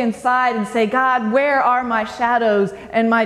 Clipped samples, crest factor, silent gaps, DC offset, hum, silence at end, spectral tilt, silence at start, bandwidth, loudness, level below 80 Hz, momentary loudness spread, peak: under 0.1%; 14 dB; none; under 0.1%; none; 0 s; -5.5 dB/octave; 0 s; 12 kHz; -17 LUFS; -56 dBFS; 4 LU; -4 dBFS